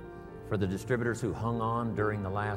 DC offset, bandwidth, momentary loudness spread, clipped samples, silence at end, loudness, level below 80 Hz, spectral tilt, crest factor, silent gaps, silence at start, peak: under 0.1%; 14 kHz; 6 LU; under 0.1%; 0 s; -32 LUFS; -52 dBFS; -7 dB/octave; 16 dB; none; 0 s; -16 dBFS